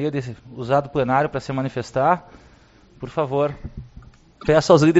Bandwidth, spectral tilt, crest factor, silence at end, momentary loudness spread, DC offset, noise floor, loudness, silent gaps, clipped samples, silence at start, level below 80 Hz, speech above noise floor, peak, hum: 8 kHz; -6 dB/octave; 20 dB; 0 s; 17 LU; under 0.1%; -51 dBFS; -21 LUFS; none; under 0.1%; 0 s; -46 dBFS; 31 dB; -2 dBFS; none